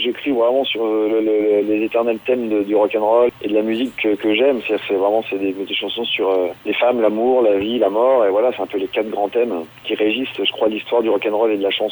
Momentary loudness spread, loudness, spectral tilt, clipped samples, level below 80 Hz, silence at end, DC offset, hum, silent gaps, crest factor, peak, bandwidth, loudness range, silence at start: 6 LU; -18 LUFS; -6 dB/octave; under 0.1%; -60 dBFS; 0 s; under 0.1%; none; none; 14 dB; -2 dBFS; over 20 kHz; 2 LU; 0 s